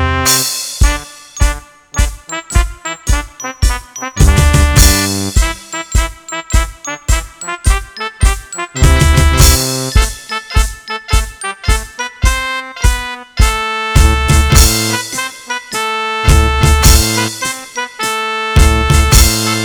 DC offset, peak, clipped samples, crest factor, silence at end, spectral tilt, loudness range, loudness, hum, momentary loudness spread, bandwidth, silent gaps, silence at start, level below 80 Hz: under 0.1%; 0 dBFS; 1%; 12 dB; 0 s; -3.5 dB/octave; 6 LU; -13 LUFS; none; 13 LU; over 20 kHz; none; 0 s; -14 dBFS